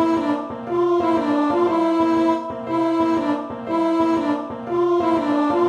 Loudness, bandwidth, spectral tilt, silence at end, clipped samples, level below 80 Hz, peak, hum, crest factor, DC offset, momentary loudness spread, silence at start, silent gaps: -20 LUFS; 9.4 kHz; -6.5 dB/octave; 0 s; under 0.1%; -56 dBFS; -8 dBFS; none; 12 dB; under 0.1%; 7 LU; 0 s; none